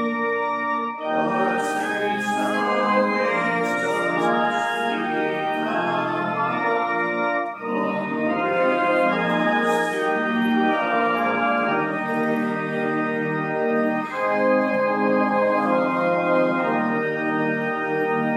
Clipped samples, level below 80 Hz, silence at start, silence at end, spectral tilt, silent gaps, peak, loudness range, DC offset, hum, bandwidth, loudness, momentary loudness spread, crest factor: under 0.1%; -76 dBFS; 0 s; 0 s; -6 dB/octave; none; -6 dBFS; 2 LU; under 0.1%; none; 15 kHz; -22 LUFS; 4 LU; 14 dB